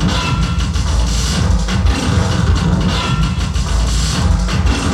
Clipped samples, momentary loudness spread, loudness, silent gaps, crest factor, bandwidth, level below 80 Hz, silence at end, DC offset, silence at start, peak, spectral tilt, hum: under 0.1%; 3 LU; -16 LUFS; none; 12 dB; 12.5 kHz; -18 dBFS; 0 s; under 0.1%; 0 s; -2 dBFS; -5 dB/octave; none